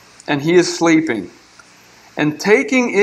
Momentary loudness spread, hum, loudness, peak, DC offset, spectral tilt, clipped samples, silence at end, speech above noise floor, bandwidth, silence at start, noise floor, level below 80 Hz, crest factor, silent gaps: 11 LU; none; -15 LUFS; 0 dBFS; under 0.1%; -4.5 dB/octave; under 0.1%; 0 s; 31 dB; 13.5 kHz; 0.3 s; -46 dBFS; -62 dBFS; 16 dB; none